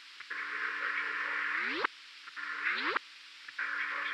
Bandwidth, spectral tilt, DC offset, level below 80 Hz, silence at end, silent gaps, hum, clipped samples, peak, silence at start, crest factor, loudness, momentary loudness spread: 13 kHz; -1 dB/octave; under 0.1%; under -90 dBFS; 0 s; none; none; under 0.1%; -14 dBFS; 0 s; 22 dB; -34 LUFS; 13 LU